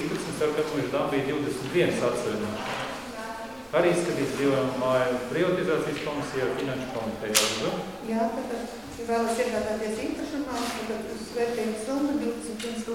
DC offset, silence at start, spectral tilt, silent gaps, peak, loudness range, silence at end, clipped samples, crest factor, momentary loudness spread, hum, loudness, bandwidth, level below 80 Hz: 0.1%; 0 s; -4 dB/octave; none; -2 dBFS; 3 LU; 0 s; under 0.1%; 24 dB; 9 LU; none; -28 LUFS; 18 kHz; -56 dBFS